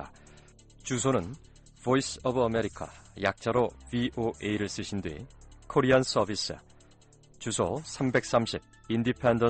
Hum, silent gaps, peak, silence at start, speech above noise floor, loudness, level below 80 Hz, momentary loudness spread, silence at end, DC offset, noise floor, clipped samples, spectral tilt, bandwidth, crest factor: none; none; -12 dBFS; 0 s; 29 dB; -29 LUFS; -54 dBFS; 17 LU; 0 s; under 0.1%; -57 dBFS; under 0.1%; -5 dB/octave; 9 kHz; 18 dB